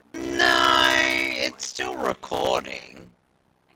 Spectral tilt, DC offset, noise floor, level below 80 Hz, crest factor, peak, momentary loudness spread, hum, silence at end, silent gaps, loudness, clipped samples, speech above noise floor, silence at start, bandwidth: -2 dB/octave; under 0.1%; -65 dBFS; -54 dBFS; 20 dB; -4 dBFS; 13 LU; none; 0.7 s; none; -21 LUFS; under 0.1%; 37 dB; 0.15 s; 17 kHz